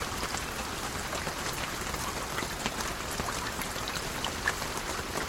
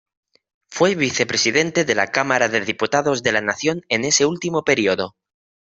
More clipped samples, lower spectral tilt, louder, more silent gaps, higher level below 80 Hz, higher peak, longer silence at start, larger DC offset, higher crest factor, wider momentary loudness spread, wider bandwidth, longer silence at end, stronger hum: neither; about the same, -2.5 dB/octave vs -3 dB/octave; second, -33 LUFS vs -19 LUFS; neither; first, -46 dBFS vs -60 dBFS; second, -10 dBFS vs 0 dBFS; second, 0 s vs 0.7 s; neither; about the same, 24 dB vs 20 dB; about the same, 3 LU vs 5 LU; first, 19 kHz vs 8.4 kHz; second, 0 s vs 0.65 s; neither